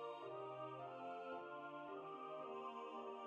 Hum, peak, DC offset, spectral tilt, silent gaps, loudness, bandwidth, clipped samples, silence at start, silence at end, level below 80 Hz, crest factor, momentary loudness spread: none; -40 dBFS; under 0.1%; -6.5 dB/octave; none; -51 LUFS; 8.2 kHz; under 0.1%; 0 s; 0 s; under -90 dBFS; 12 dB; 2 LU